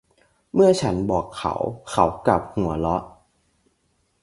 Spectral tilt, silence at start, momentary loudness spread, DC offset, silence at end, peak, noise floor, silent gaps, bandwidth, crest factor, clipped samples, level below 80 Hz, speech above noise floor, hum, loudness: -6.5 dB/octave; 0.55 s; 9 LU; under 0.1%; 1.15 s; -2 dBFS; -68 dBFS; none; 11.5 kHz; 20 dB; under 0.1%; -44 dBFS; 47 dB; none; -22 LUFS